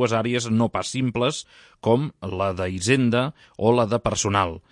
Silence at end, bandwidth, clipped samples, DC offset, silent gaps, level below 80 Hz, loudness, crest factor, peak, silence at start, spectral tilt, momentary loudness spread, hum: 0.1 s; 11.5 kHz; under 0.1%; under 0.1%; none; -52 dBFS; -23 LUFS; 18 dB; -4 dBFS; 0 s; -5 dB/octave; 7 LU; none